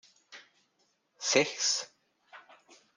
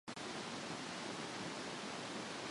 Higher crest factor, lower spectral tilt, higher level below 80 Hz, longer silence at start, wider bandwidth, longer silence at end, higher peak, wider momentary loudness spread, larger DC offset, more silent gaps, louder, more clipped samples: first, 26 dB vs 14 dB; second, -1 dB/octave vs -3 dB/octave; second, -84 dBFS vs -78 dBFS; first, 0.3 s vs 0.05 s; about the same, 11 kHz vs 11.5 kHz; first, 0.55 s vs 0 s; first, -10 dBFS vs -32 dBFS; first, 26 LU vs 0 LU; neither; neither; first, -29 LUFS vs -45 LUFS; neither